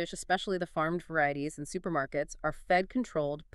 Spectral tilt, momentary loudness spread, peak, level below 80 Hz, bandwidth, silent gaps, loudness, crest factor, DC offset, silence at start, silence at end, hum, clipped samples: -5 dB/octave; 8 LU; -14 dBFS; -54 dBFS; 12.5 kHz; none; -32 LUFS; 18 dB; under 0.1%; 0 s; 0.1 s; none; under 0.1%